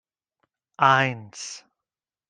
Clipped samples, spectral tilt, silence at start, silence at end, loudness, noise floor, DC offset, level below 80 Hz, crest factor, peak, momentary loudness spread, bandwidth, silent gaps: under 0.1%; -4 dB/octave; 0.8 s; 0.7 s; -20 LUFS; -90 dBFS; under 0.1%; -72 dBFS; 22 dB; -4 dBFS; 18 LU; 10 kHz; none